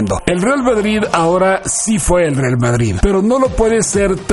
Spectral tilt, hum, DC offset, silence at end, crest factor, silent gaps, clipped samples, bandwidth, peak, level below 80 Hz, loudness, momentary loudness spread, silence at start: -5 dB/octave; none; under 0.1%; 0 s; 14 dB; none; under 0.1%; 11.5 kHz; 0 dBFS; -26 dBFS; -14 LUFS; 2 LU; 0 s